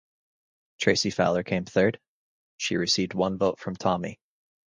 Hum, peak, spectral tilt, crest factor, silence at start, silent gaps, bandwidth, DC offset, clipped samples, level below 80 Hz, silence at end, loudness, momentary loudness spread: none; -6 dBFS; -4.5 dB/octave; 22 dB; 0.8 s; 2.08-2.58 s; 10 kHz; under 0.1%; under 0.1%; -58 dBFS; 0.55 s; -26 LUFS; 7 LU